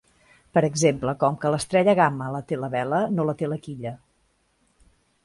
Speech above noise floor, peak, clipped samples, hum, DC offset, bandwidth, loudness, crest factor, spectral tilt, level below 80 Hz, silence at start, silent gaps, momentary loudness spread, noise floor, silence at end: 44 dB; -4 dBFS; under 0.1%; none; under 0.1%; 11.5 kHz; -23 LUFS; 20 dB; -5.5 dB/octave; -58 dBFS; 0.55 s; none; 12 LU; -67 dBFS; 1.3 s